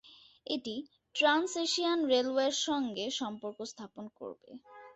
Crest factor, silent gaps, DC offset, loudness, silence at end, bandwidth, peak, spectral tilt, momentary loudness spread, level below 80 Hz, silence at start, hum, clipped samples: 20 dB; none; under 0.1%; -32 LUFS; 0.05 s; 8.2 kHz; -14 dBFS; -2 dB/octave; 19 LU; -76 dBFS; 0.05 s; none; under 0.1%